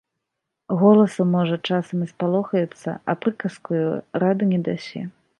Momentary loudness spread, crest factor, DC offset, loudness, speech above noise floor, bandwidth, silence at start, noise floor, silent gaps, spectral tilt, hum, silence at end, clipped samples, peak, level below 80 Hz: 13 LU; 18 dB; under 0.1%; -22 LUFS; 60 dB; 11 kHz; 0.7 s; -81 dBFS; none; -8 dB/octave; none; 0.3 s; under 0.1%; -4 dBFS; -68 dBFS